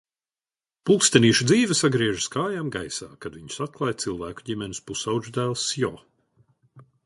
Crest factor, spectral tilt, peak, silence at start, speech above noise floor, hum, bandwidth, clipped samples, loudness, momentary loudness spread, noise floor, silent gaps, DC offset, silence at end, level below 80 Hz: 24 dB; -4 dB/octave; 0 dBFS; 0.85 s; over 66 dB; none; 11.5 kHz; under 0.1%; -23 LUFS; 15 LU; under -90 dBFS; none; under 0.1%; 0.25 s; -56 dBFS